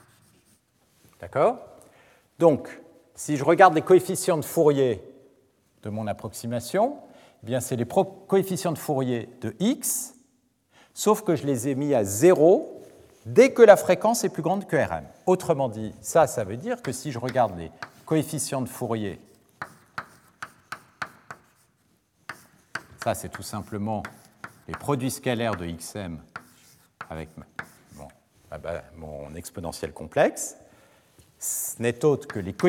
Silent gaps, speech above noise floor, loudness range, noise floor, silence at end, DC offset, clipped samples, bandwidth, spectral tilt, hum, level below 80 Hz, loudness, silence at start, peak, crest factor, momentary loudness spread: none; 43 dB; 17 LU; -67 dBFS; 0 s; under 0.1%; under 0.1%; 17.5 kHz; -5 dB/octave; none; -62 dBFS; -24 LUFS; 1.2 s; 0 dBFS; 24 dB; 22 LU